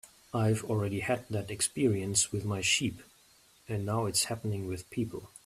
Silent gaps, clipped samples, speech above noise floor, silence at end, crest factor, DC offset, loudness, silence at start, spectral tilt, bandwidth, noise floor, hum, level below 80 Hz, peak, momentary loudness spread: none; under 0.1%; 31 dB; 0.2 s; 20 dB; under 0.1%; -31 LUFS; 0.05 s; -4 dB/octave; 14.5 kHz; -62 dBFS; none; -62 dBFS; -14 dBFS; 9 LU